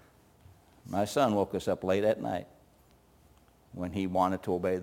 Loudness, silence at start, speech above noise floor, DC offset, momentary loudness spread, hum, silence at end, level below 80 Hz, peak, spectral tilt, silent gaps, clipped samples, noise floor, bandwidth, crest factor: -31 LUFS; 0.85 s; 32 dB; under 0.1%; 10 LU; none; 0 s; -64 dBFS; -12 dBFS; -6 dB/octave; none; under 0.1%; -62 dBFS; 17 kHz; 20 dB